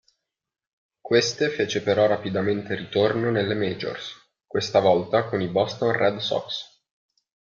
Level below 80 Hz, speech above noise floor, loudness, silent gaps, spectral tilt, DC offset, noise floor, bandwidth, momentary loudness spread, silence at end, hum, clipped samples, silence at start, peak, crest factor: -64 dBFS; 64 dB; -23 LUFS; none; -5 dB/octave; under 0.1%; -87 dBFS; 7.4 kHz; 10 LU; 0.95 s; none; under 0.1%; 1.05 s; -6 dBFS; 20 dB